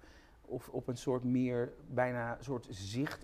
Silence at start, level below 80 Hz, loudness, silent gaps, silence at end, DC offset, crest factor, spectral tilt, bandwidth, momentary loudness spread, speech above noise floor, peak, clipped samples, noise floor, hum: 0.05 s; -62 dBFS; -37 LUFS; none; 0 s; under 0.1%; 20 dB; -6.5 dB/octave; 15 kHz; 9 LU; 22 dB; -18 dBFS; under 0.1%; -59 dBFS; none